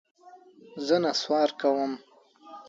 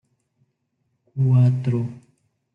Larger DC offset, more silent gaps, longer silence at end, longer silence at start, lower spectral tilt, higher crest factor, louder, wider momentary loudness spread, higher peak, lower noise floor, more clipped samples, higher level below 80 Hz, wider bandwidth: neither; neither; second, 0.05 s vs 0.55 s; second, 0.25 s vs 1.15 s; second, -4 dB/octave vs -10.5 dB/octave; about the same, 18 dB vs 16 dB; second, -26 LUFS vs -20 LUFS; first, 18 LU vs 15 LU; about the same, -10 dBFS vs -8 dBFS; second, -53 dBFS vs -73 dBFS; neither; second, -78 dBFS vs -66 dBFS; first, 7.8 kHz vs 3.1 kHz